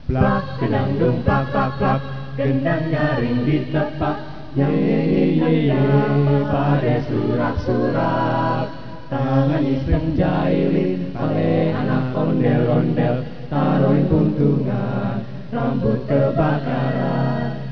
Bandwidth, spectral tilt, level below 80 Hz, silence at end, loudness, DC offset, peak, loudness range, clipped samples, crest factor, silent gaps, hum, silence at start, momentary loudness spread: 5.4 kHz; -10 dB/octave; -38 dBFS; 0 s; -20 LUFS; 2%; -2 dBFS; 2 LU; under 0.1%; 16 dB; none; none; 0 s; 7 LU